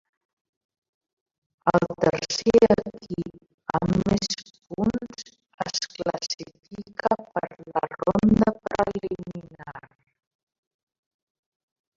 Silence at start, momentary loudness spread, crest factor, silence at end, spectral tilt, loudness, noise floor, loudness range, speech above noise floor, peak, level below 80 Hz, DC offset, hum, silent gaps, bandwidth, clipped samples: 1.65 s; 20 LU; 24 dB; 2.2 s; -5.5 dB/octave; -25 LUFS; -43 dBFS; 6 LU; 21 dB; -4 dBFS; -50 dBFS; under 0.1%; none; 3.54-3.58 s, 5.54-5.58 s; 7.6 kHz; under 0.1%